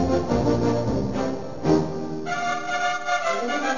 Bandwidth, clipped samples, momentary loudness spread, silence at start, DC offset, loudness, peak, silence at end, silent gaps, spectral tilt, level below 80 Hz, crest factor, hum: 7.4 kHz; under 0.1%; 6 LU; 0 s; 2%; -24 LUFS; -6 dBFS; 0 s; none; -5.5 dB/octave; -42 dBFS; 16 dB; none